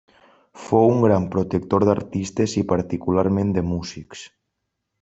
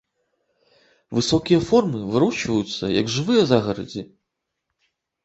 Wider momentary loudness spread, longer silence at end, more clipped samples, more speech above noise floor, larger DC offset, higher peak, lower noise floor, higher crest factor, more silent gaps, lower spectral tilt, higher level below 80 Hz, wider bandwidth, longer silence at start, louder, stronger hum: first, 18 LU vs 10 LU; second, 0.75 s vs 1.2 s; neither; about the same, 58 dB vs 60 dB; neither; about the same, -4 dBFS vs -2 dBFS; about the same, -78 dBFS vs -80 dBFS; about the same, 18 dB vs 20 dB; neither; first, -7.5 dB/octave vs -5.5 dB/octave; about the same, -54 dBFS vs -52 dBFS; about the same, 8 kHz vs 8.2 kHz; second, 0.55 s vs 1.1 s; about the same, -21 LUFS vs -21 LUFS; neither